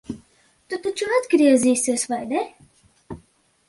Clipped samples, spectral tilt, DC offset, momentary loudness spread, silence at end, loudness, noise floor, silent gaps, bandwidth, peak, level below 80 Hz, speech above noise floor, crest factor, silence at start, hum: under 0.1%; -3.5 dB/octave; under 0.1%; 24 LU; 0.55 s; -20 LUFS; -59 dBFS; none; 11.5 kHz; -6 dBFS; -58 dBFS; 39 dB; 16 dB; 0.1 s; none